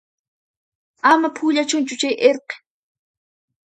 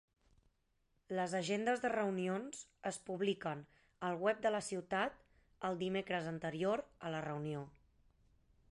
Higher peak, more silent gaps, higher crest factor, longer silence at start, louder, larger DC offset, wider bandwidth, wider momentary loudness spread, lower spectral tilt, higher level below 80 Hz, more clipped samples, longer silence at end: first, 0 dBFS vs -22 dBFS; neither; about the same, 20 dB vs 20 dB; about the same, 1.05 s vs 1.1 s; first, -18 LUFS vs -40 LUFS; neither; about the same, 10.5 kHz vs 11 kHz; first, 13 LU vs 9 LU; second, -1.5 dB/octave vs -5 dB/octave; about the same, -74 dBFS vs -74 dBFS; neither; about the same, 1.1 s vs 1.05 s